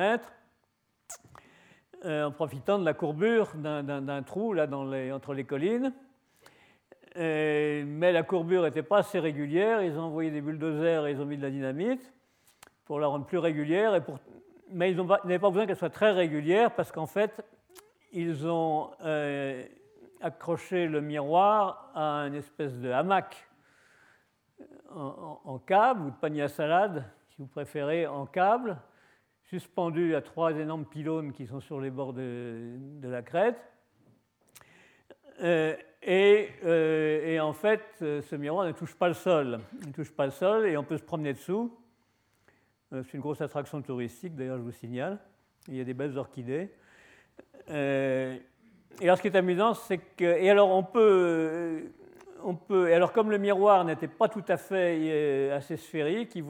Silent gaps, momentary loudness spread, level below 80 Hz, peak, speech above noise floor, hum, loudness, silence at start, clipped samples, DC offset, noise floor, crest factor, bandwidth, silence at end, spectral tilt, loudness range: none; 15 LU; -76 dBFS; -8 dBFS; 47 dB; none; -29 LUFS; 0 s; under 0.1%; under 0.1%; -75 dBFS; 22 dB; 18 kHz; 0 s; -6.5 dB/octave; 10 LU